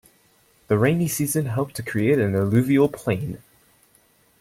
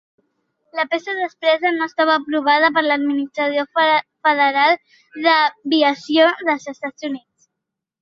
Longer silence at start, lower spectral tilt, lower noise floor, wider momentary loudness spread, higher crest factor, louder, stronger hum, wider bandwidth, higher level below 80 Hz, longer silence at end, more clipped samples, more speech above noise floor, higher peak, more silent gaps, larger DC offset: about the same, 0.7 s vs 0.75 s; first, -6.5 dB/octave vs -3.5 dB/octave; second, -60 dBFS vs -82 dBFS; second, 8 LU vs 11 LU; about the same, 16 dB vs 16 dB; second, -22 LUFS vs -17 LUFS; neither; first, 16.5 kHz vs 7.6 kHz; first, -56 dBFS vs -72 dBFS; first, 1.05 s vs 0.85 s; neither; second, 39 dB vs 64 dB; second, -6 dBFS vs -2 dBFS; neither; neither